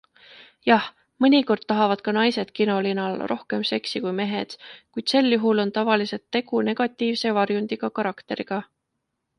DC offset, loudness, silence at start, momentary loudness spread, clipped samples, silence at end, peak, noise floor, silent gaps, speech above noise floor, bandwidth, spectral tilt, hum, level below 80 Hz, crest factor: under 0.1%; -23 LUFS; 0.65 s; 9 LU; under 0.1%; 0.75 s; -4 dBFS; -79 dBFS; none; 56 dB; 11 kHz; -5.5 dB/octave; none; -70 dBFS; 20 dB